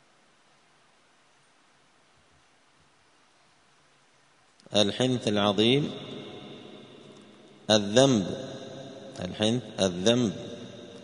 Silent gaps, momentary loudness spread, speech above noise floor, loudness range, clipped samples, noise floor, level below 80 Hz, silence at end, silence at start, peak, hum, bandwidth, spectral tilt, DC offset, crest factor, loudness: none; 22 LU; 38 dB; 5 LU; under 0.1%; -63 dBFS; -66 dBFS; 0 s; 4.7 s; -6 dBFS; none; 10.5 kHz; -4.5 dB/octave; under 0.1%; 24 dB; -26 LUFS